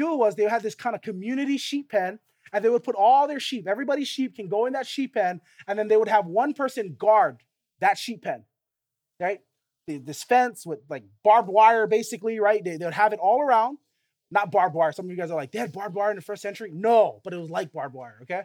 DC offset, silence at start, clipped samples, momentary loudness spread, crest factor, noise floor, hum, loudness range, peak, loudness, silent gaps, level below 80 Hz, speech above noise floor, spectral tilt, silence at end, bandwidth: under 0.1%; 0 s; under 0.1%; 14 LU; 20 dB; -85 dBFS; none; 5 LU; -6 dBFS; -24 LUFS; none; -86 dBFS; 61 dB; -4.5 dB/octave; 0 s; 17 kHz